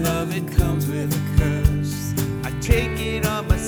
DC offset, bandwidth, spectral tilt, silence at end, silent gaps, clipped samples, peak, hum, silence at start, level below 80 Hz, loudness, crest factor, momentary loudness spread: under 0.1%; over 20 kHz; -6 dB/octave; 0 s; none; under 0.1%; -2 dBFS; none; 0 s; -26 dBFS; -22 LUFS; 18 dB; 4 LU